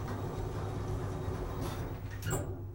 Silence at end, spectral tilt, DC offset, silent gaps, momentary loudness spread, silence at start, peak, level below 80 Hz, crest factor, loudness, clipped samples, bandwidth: 0 s; -6 dB/octave; under 0.1%; none; 3 LU; 0 s; -20 dBFS; -44 dBFS; 16 dB; -38 LUFS; under 0.1%; 16.5 kHz